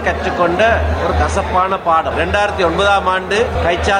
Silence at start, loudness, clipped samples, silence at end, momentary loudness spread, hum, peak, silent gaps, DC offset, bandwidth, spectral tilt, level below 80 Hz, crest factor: 0 s; -15 LUFS; under 0.1%; 0 s; 3 LU; none; -2 dBFS; none; under 0.1%; 10.5 kHz; -5 dB/octave; -26 dBFS; 12 dB